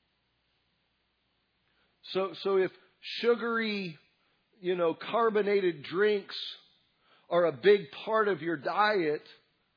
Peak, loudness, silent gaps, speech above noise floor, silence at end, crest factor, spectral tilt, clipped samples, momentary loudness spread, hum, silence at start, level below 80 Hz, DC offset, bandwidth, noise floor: -10 dBFS; -29 LUFS; none; 47 dB; 0.45 s; 20 dB; -3 dB/octave; under 0.1%; 12 LU; none; 2.05 s; -88 dBFS; under 0.1%; 5.4 kHz; -76 dBFS